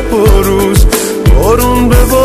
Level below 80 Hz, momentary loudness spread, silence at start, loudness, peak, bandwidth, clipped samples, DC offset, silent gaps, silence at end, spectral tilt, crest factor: -10 dBFS; 2 LU; 0 s; -9 LUFS; 0 dBFS; 14.5 kHz; 0.5%; under 0.1%; none; 0 s; -5.5 dB/octave; 6 dB